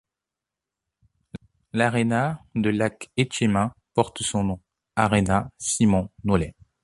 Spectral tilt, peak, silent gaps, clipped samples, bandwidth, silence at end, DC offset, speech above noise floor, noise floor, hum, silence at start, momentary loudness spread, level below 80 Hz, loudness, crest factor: -5 dB/octave; -4 dBFS; none; under 0.1%; 11.5 kHz; 0.35 s; under 0.1%; 65 dB; -87 dBFS; none; 1.75 s; 12 LU; -46 dBFS; -24 LUFS; 22 dB